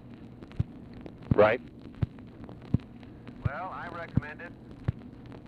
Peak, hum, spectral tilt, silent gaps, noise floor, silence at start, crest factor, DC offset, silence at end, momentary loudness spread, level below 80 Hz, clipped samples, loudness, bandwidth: -10 dBFS; none; -9.5 dB/octave; none; -47 dBFS; 0 s; 22 dB; under 0.1%; 0 s; 23 LU; -48 dBFS; under 0.1%; -31 LUFS; 5.8 kHz